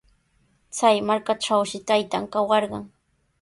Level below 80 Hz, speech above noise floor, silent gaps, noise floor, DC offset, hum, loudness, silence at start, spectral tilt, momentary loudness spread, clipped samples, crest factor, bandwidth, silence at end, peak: -64 dBFS; 43 dB; none; -65 dBFS; under 0.1%; none; -22 LUFS; 0.75 s; -3.5 dB/octave; 10 LU; under 0.1%; 20 dB; 11.5 kHz; 0.55 s; -4 dBFS